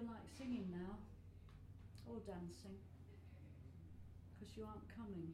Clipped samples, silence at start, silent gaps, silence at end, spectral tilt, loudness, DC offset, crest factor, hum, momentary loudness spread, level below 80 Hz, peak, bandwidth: under 0.1%; 0 s; none; 0 s; -7 dB/octave; -54 LUFS; under 0.1%; 18 dB; none; 13 LU; -66 dBFS; -36 dBFS; 15.5 kHz